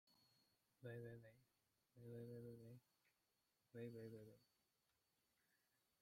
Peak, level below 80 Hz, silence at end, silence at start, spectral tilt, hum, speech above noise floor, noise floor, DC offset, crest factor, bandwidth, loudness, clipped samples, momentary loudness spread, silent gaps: -44 dBFS; under -90 dBFS; 1.55 s; 0.05 s; -7.5 dB/octave; none; 31 dB; -89 dBFS; under 0.1%; 20 dB; 16 kHz; -60 LUFS; under 0.1%; 9 LU; none